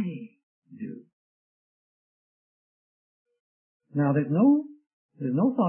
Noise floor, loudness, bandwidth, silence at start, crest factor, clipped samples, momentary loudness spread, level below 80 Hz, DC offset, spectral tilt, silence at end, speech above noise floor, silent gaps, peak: under -90 dBFS; -25 LUFS; 3.2 kHz; 0 s; 18 dB; under 0.1%; 20 LU; -78 dBFS; under 0.1%; -13 dB/octave; 0 s; over 67 dB; 0.43-0.62 s, 1.13-3.26 s, 3.40-3.80 s, 4.93-5.09 s; -10 dBFS